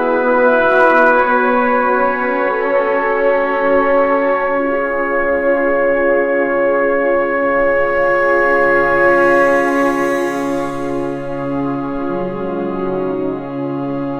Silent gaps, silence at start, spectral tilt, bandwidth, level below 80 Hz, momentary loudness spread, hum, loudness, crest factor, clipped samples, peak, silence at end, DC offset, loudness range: none; 0 s; -6.5 dB/octave; 12.5 kHz; -42 dBFS; 9 LU; none; -14 LUFS; 14 dB; under 0.1%; 0 dBFS; 0 s; 0.4%; 6 LU